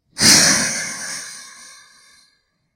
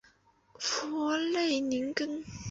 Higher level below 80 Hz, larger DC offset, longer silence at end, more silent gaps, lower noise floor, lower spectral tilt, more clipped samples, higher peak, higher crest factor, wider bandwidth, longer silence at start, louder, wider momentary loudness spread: first, -54 dBFS vs -62 dBFS; neither; first, 1.1 s vs 0 s; neither; about the same, -63 dBFS vs -65 dBFS; second, -0.5 dB/octave vs -3 dB/octave; neither; first, 0 dBFS vs -14 dBFS; about the same, 20 dB vs 20 dB; first, 16.5 kHz vs 8 kHz; second, 0.15 s vs 0.6 s; first, -13 LUFS vs -32 LUFS; first, 22 LU vs 7 LU